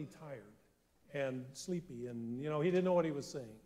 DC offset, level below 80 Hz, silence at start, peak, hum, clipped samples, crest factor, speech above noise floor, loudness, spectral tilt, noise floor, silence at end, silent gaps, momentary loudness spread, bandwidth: under 0.1%; -74 dBFS; 0 s; -22 dBFS; none; under 0.1%; 16 dB; 32 dB; -38 LUFS; -6.5 dB/octave; -70 dBFS; 0.05 s; none; 16 LU; 15 kHz